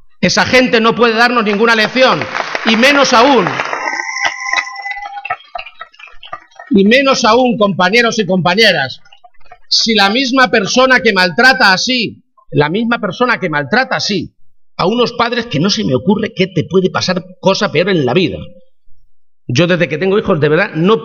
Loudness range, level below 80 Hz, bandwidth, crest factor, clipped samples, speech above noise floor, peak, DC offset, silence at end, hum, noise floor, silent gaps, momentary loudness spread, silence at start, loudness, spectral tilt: 5 LU; -48 dBFS; 16 kHz; 12 dB; under 0.1%; 28 dB; 0 dBFS; under 0.1%; 0 s; none; -39 dBFS; none; 13 LU; 0.2 s; -11 LUFS; -4 dB/octave